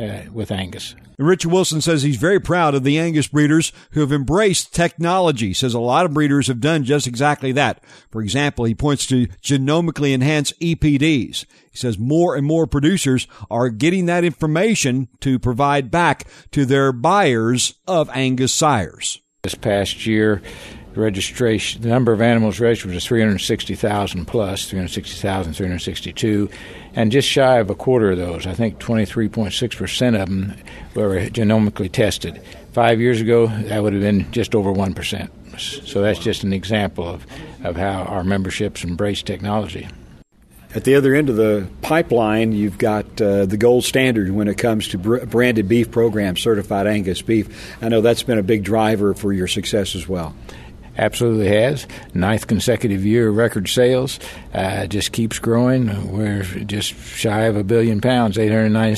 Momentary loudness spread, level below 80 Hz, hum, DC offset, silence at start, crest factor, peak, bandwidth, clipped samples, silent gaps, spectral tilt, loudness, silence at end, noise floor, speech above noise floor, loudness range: 10 LU; -42 dBFS; none; under 0.1%; 0 s; 18 dB; 0 dBFS; 13.5 kHz; under 0.1%; none; -5.5 dB/octave; -18 LUFS; 0 s; -47 dBFS; 29 dB; 4 LU